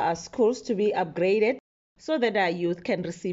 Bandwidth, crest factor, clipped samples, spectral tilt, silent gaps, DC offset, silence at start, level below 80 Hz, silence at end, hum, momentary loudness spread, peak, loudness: 8 kHz; 14 dB; under 0.1%; -4 dB/octave; 1.60-1.96 s; under 0.1%; 0 s; -66 dBFS; 0 s; none; 7 LU; -12 dBFS; -26 LUFS